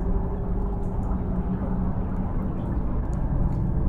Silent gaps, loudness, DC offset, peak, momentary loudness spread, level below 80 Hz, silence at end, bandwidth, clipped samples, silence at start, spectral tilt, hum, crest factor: none; -28 LUFS; under 0.1%; -10 dBFS; 3 LU; -28 dBFS; 0 s; 3.1 kHz; under 0.1%; 0 s; -11 dB/octave; none; 14 dB